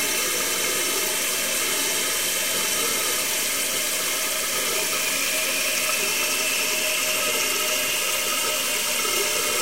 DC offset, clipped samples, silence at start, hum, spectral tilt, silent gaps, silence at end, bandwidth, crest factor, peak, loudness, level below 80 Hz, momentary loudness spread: 0.6%; under 0.1%; 0 s; none; 0.5 dB/octave; none; 0 s; 16 kHz; 14 dB; -8 dBFS; -21 LUFS; -58 dBFS; 1 LU